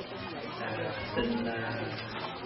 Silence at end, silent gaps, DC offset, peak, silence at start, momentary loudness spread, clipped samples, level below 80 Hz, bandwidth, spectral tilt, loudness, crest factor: 0 s; none; under 0.1%; -18 dBFS; 0 s; 7 LU; under 0.1%; -56 dBFS; 5.8 kHz; -3.5 dB/octave; -35 LUFS; 18 dB